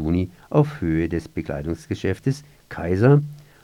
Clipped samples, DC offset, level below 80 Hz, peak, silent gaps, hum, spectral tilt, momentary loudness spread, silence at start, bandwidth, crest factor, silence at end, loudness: under 0.1%; under 0.1%; -42 dBFS; -4 dBFS; none; none; -8.5 dB/octave; 14 LU; 0 s; 11.5 kHz; 18 dB; 0.2 s; -23 LUFS